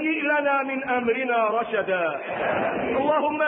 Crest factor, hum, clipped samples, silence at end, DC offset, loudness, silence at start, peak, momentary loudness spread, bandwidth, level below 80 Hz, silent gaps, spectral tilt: 14 dB; none; under 0.1%; 0 s; under 0.1%; -24 LUFS; 0 s; -10 dBFS; 3 LU; 4.5 kHz; -60 dBFS; none; -9.5 dB/octave